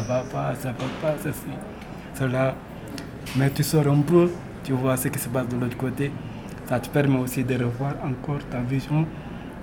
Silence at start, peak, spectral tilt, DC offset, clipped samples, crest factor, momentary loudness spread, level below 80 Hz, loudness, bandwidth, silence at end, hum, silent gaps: 0 s; -6 dBFS; -6.5 dB/octave; under 0.1%; under 0.1%; 18 dB; 16 LU; -48 dBFS; -25 LUFS; 18.5 kHz; 0 s; none; none